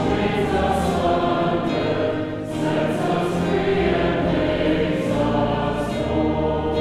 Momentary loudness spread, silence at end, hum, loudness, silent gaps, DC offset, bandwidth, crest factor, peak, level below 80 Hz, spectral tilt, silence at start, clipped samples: 3 LU; 0 s; none; -21 LUFS; none; under 0.1%; 13.5 kHz; 14 dB; -8 dBFS; -36 dBFS; -7 dB/octave; 0 s; under 0.1%